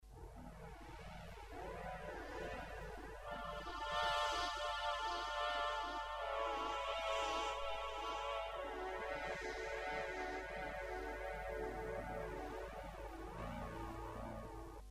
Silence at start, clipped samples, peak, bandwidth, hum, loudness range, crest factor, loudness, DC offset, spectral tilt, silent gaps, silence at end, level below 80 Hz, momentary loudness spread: 0 s; under 0.1%; -26 dBFS; 15.5 kHz; none; 7 LU; 18 dB; -44 LUFS; under 0.1%; -3.5 dB/octave; none; 0 s; -56 dBFS; 12 LU